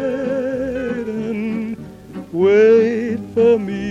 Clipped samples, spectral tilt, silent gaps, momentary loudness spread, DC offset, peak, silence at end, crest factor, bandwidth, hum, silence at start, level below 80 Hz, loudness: under 0.1%; -7.5 dB/octave; none; 16 LU; under 0.1%; -4 dBFS; 0 s; 14 dB; 7.6 kHz; none; 0 s; -48 dBFS; -17 LUFS